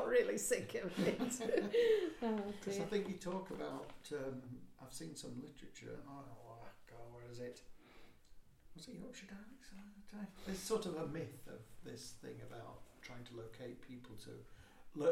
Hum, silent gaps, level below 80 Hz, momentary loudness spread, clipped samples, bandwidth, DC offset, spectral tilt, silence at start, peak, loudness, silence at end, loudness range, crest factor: none; none; -66 dBFS; 20 LU; under 0.1%; 16.5 kHz; under 0.1%; -4.5 dB/octave; 0 s; -22 dBFS; -42 LUFS; 0 s; 17 LU; 22 dB